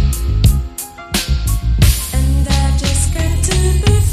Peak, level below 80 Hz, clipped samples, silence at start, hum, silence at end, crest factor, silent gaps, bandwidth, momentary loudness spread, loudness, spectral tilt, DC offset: 0 dBFS; -16 dBFS; under 0.1%; 0 s; none; 0 s; 14 dB; none; 15.5 kHz; 6 LU; -15 LUFS; -4.5 dB/octave; under 0.1%